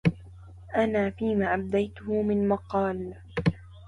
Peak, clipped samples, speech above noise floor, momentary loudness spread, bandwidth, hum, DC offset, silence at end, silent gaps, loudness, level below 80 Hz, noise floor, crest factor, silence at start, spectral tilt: -10 dBFS; under 0.1%; 20 dB; 6 LU; 10.5 kHz; none; under 0.1%; 0 s; none; -28 LUFS; -48 dBFS; -46 dBFS; 16 dB; 0.05 s; -8.5 dB/octave